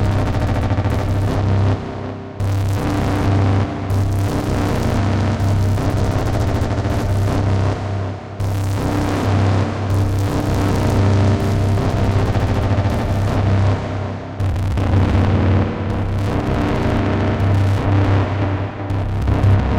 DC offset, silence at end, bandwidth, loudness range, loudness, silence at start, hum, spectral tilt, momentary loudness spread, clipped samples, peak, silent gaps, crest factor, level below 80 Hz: under 0.1%; 0 s; 11.5 kHz; 2 LU; -18 LUFS; 0 s; none; -7.5 dB/octave; 6 LU; under 0.1%; -2 dBFS; none; 14 dB; -26 dBFS